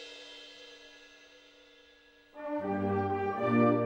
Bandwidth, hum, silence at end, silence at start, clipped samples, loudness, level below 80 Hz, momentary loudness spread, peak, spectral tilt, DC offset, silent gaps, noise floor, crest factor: 8.2 kHz; none; 0 s; 0 s; under 0.1%; -31 LUFS; -74 dBFS; 26 LU; -16 dBFS; -7.5 dB/octave; under 0.1%; none; -61 dBFS; 18 dB